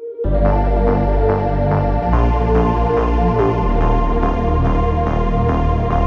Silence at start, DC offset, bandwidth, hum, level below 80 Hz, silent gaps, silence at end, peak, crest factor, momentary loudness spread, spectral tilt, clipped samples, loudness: 0 s; under 0.1%; 6.2 kHz; none; -18 dBFS; none; 0 s; -2 dBFS; 12 dB; 2 LU; -9.5 dB/octave; under 0.1%; -17 LUFS